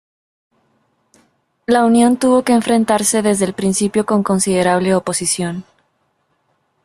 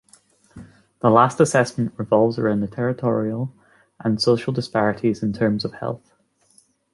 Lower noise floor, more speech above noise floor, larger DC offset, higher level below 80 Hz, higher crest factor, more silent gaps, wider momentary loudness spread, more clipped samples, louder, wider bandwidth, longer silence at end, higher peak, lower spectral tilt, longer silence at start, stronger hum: first, -64 dBFS vs -59 dBFS; first, 50 dB vs 39 dB; neither; about the same, -54 dBFS vs -56 dBFS; second, 14 dB vs 20 dB; neither; second, 6 LU vs 12 LU; neither; first, -15 LUFS vs -21 LUFS; first, 14 kHz vs 11.5 kHz; first, 1.2 s vs 0.95 s; about the same, -2 dBFS vs -2 dBFS; second, -4.5 dB/octave vs -6 dB/octave; first, 1.7 s vs 0.55 s; neither